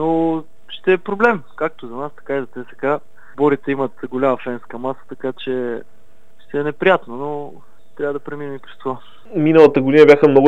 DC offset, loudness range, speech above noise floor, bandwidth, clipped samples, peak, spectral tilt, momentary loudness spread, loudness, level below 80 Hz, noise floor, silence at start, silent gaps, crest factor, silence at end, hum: 2%; 6 LU; 38 dB; 7.4 kHz; under 0.1%; 0 dBFS; -7.5 dB/octave; 18 LU; -18 LUFS; -58 dBFS; -55 dBFS; 0 s; none; 18 dB; 0 s; none